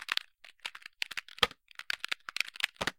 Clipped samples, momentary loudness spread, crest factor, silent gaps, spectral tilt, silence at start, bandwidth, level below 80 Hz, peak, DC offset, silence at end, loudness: under 0.1%; 13 LU; 30 dB; none; -1 dB/octave; 0 s; 17 kHz; -62 dBFS; -6 dBFS; under 0.1%; 0.05 s; -35 LUFS